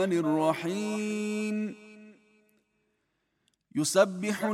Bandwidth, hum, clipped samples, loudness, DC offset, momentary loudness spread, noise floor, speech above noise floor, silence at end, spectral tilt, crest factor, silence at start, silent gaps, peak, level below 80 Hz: 16 kHz; none; under 0.1%; -29 LUFS; under 0.1%; 11 LU; -77 dBFS; 49 dB; 0 s; -4.5 dB/octave; 22 dB; 0 s; none; -10 dBFS; -80 dBFS